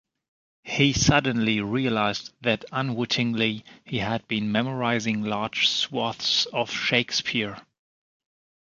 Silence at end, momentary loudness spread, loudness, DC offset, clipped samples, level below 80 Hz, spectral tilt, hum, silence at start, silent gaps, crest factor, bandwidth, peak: 1.05 s; 7 LU; -24 LUFS; under 0.1%; under 0.1%; -50 dBFS; -4 dB/octave; none; 0.65 s; none; 22 dB; 7.6 kHz; -4 dBFS